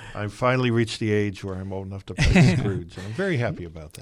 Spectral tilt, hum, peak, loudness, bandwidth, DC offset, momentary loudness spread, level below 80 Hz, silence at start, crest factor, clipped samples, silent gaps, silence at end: -6.5 dB/octave; none; -6 dBFS; -23 LUFS; 12.5 kHz; under 0.1%; 16 LU; -36 dBFS; 0 s; 18 dB; under 0.1%; none; 0 s